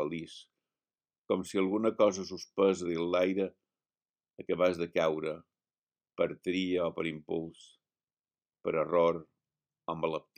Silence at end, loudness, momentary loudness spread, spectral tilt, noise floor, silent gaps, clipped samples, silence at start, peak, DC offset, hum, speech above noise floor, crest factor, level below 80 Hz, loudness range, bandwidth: 0.2 s; -32 LUFS; 13 LU; -5.5 dB/octave; under -90 dBFS; 1.18-1.22 s, 4.10-4.14 s, 5.78-5.87 s; under 0.1%; 0 s; -14 dBFS; under 0.1%; none; over 59 dB; 20 dB; -72 dBFS; 4 LU; 14.5 kHz